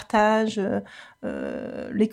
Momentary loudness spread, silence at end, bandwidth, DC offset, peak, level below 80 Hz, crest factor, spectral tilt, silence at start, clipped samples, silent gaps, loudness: 14 LU; 0 s; 11 kHz; under 0.1%; -8 dBFS; -56 dBFS; 18 dB; -6 dB/octave; 0 s; under 0.1%; none; -25 LUFS